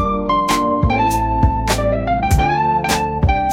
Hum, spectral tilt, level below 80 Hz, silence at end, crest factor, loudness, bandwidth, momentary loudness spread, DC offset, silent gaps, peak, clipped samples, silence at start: none; -5.5 dB/octave; -24 dBFS; 0 s; 14 dB; -16 LUFS; 17 kHz; 2 LU; 0.2%; none; -2 dBFS; under 0.1%; 0 s